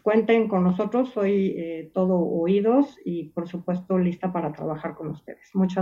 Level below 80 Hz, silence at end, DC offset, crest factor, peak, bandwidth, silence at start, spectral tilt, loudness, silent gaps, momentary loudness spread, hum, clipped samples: -62 dBFS; 0 s; under 0.1%; 16 dB; -8 dBFS; 7 kHz; 0.05 s; -9.5 dB/octave; -24 LUFS; none; 12 LU; none; under 0.1%